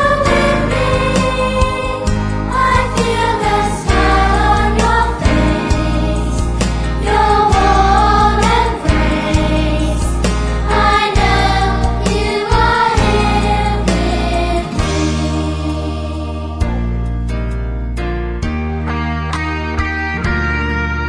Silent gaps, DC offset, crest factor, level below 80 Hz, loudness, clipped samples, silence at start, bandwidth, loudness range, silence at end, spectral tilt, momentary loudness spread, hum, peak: none; 0.2%; 14 dB; -18 dBFS; -15 LUFS; under 0.1%; 0 s; 10.5 kHz; 7 LU; 0 s; -5.5 dB/octave; 9 LU; none; 0 dBFS